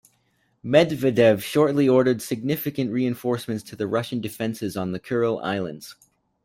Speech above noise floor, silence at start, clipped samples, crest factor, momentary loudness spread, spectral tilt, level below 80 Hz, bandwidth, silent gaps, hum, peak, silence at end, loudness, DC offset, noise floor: 45 dB; 0.65 s; under 0.1%; 20 dB; 11 LU; -6 dB/octave; -62 dBFS; 16.5 kHz; none; none; -4 dBFS; 0.5 s; -23 LUFS; under 0.1%; -67 dBFS